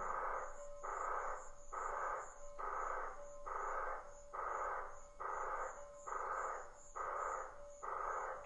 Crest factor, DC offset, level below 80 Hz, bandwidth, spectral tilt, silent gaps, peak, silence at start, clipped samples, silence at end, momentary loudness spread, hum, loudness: 16 dB; under 0.1%; -58 dBFS; 11 kHz; -3 dB/octave; none; -30 dBFS; 0 s; under 0.1%; 0 s; 9 LU; none; -45 LUFS